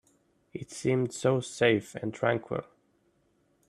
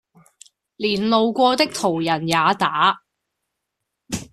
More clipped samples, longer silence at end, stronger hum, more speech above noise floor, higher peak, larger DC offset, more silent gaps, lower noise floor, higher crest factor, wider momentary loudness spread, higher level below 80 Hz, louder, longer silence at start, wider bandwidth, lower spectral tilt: neither; first, 1.05 s vs 0.1 s; neither; second, 41 dB vs 61 dB; second, -10 dBFS vs -2 dBFS; neither; neither; second, -70 dBFS vs -80 dBFS; about the same, 22 dB vs 18 dB; first, 14 LU vs 11 LU; second, -68 dBFS vs -58 dBFS; second, -29 LUFS vs -19 LUFS; second, 0.55 s vs 0.8 s; about the same, 13 kHz vs 14 kHz; first, -5.5 dB/octave vs -4 dB/octave